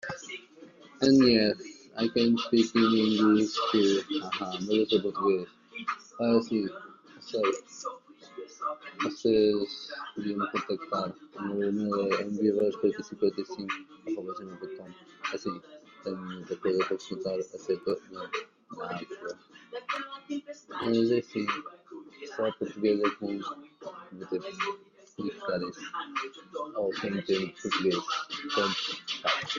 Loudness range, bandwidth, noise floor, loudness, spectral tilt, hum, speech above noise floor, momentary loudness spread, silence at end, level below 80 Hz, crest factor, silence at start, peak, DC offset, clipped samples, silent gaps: 10 LU; 7.4 kHz; -53 dBFS; -30 LUFS; -5 dB/octave; none; 23 dB; 17 LU; 0 s; -70 dBFS; 20 dB; 0.05 s; -10 dBFS; under 0.1%; under 0.1%; none